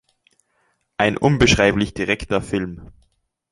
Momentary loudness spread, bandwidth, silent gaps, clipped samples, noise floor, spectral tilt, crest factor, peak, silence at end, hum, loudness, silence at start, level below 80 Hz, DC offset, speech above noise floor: 17 LU; 11.5 kHz; none; under 0.1%; -67 dBFS; -5 dB/octave; 20 dB; 0 dBFS; 0.65 s; none; -18 LUFS; 1 s; -38 dBFS; under 0.1%; 48 dB